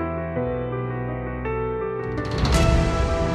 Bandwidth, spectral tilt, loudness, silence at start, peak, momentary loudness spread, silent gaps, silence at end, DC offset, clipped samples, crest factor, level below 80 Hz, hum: 13 kHz; -6 dB/octave; -24 LUFS; 0 s; -6 dBFS; 9 LU; none; 0 s; under 0.1%; under 0.1%; 16 dB; -28 dBFS; none